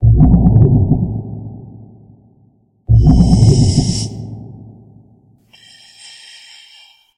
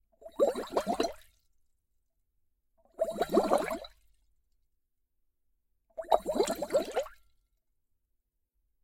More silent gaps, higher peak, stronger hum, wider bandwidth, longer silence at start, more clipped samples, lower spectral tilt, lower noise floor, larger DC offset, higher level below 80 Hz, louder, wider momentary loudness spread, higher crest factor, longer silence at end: neither; first, 0 dBFS vs -10 dBFS; neither; second, 10.5 kHz vs 16.5 kHz; second, 0 s vs 0.2 s; neither; first, -7.5 dB/octave vs -4 dB/octave; second, -53 dBFS vs -80 dBFS; neither; first, -22 dBFS vs -62 dBFS; first, -12 LUFS vs -31 LUFS; first, 25 LU vs 17 LU; second, 14 dB vs 26 dB; first, 2.7 s vs 1.7 s